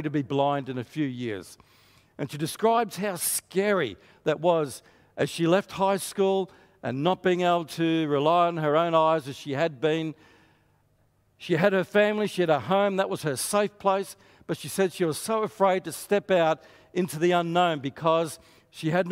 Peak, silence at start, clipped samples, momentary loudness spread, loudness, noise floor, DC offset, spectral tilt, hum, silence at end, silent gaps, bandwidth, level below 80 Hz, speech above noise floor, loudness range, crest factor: -6 dBFS; 0 s; under 0.1%; 11 LU; -26 LUFS; -66 dBFS; under 0.1%; -5 dB/octave; none; 0 s; none; 16 kHz; -68 dBFS; 40 dB; 3 LU; 20 dB